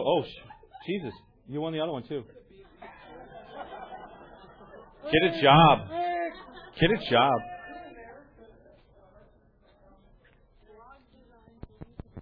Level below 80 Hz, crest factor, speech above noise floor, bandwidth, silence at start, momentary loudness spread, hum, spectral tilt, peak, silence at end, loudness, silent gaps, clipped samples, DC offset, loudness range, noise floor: -52 dBFS; 24 dB; 37 dB; 5.2 kHz; 0 s; 28 LU; none; -8.5 dB/octave; -6 dBFS; 0 s; -25 LUFS; none; under 0.1%; under 0.1%; 14 LU; -61 dBFS